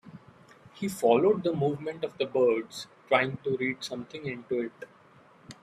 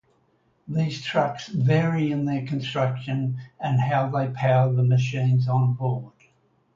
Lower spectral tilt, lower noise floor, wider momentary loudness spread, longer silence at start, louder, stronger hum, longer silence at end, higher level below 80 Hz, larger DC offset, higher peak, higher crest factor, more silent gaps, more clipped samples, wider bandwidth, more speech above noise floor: second, -5.5 dB/octave vs -7.5 dB/octave; second, -57 dBFS vs -65 dBFS; first, 15 LU vs 7 LU; second, 0.05 s vs 0.65 s; second, -29 LUFS vs -24 LUFS; neither; second, 0.1 s vs 0.65 s; second, -70 dBFS vs -62 dBFS; neither; about the same, -6 dBFS vs -8 dBFS; first, 22 dB vs 16 dB; neither; neither; first, 14.5 kHz vs 7.2 kHz; second, 29 dB vs 43 dB